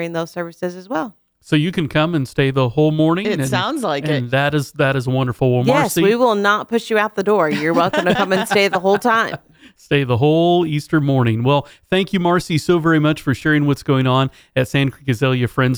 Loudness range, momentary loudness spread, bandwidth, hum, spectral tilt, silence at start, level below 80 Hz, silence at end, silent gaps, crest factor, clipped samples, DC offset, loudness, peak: 2 LU; 6 LU; over 20 kHz; none; -6 dB/octave; 0 s; -50 dBFS; 0 s; none; 14 dB; under 0.1%; under 0.1%; -17 LUFS; -4 dBFS